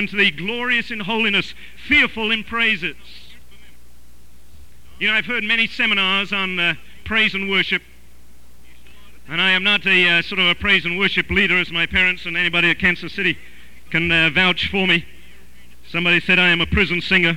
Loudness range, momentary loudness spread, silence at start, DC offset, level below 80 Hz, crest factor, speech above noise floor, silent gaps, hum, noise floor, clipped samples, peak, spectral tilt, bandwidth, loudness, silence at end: 5 LU; 8 LU; 0 s; 2%; -42 dBFS; 16 dB; 31 dB; none; 60 Hz at -50 dBFS; -50 dBFS; under 0.1%; -4 dBFS; -4.5 dB/octave; 16.5 kHz; -17 LUFS; 0 s